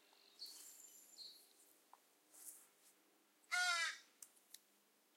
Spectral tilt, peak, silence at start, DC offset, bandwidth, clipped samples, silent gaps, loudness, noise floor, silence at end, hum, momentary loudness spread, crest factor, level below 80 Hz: 4 dB/octave; -26 dBFS; 0.4 s; under 0.1%; 16.5 kHz; under 0.1%; none; -44 LUFS; -76 dBFS; 0.6 s; none; 25 LU; 24 dB; under -90 dBFS